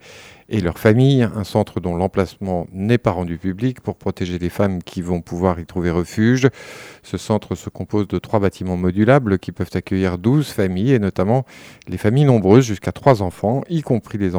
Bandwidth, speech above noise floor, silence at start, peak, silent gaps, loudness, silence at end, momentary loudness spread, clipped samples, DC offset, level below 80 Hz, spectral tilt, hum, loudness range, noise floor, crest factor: 19.5 kHz; 24 dB; 0.1 s; 0 dBFS; none; -19 LUFS; 0 s; 11 LU; under 0.1%; under 0.1%; -44 dBFS; -7.5 dB/octave; none; 4 LU; -42 dBFS; 18 dB